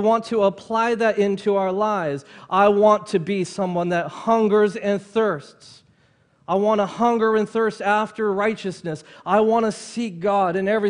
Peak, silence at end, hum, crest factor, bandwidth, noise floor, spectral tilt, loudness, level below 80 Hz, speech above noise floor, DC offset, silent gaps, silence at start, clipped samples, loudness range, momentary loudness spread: -2 dBFS; 0 s; none; 18 dB; 10.5 kHz; -60 dBFS; -6 dB/octave; -21 LUFS; -64 dBFS; 39 dB; under 0.1%; none; 0 s; under 0.1%; 3 LU; 9 LU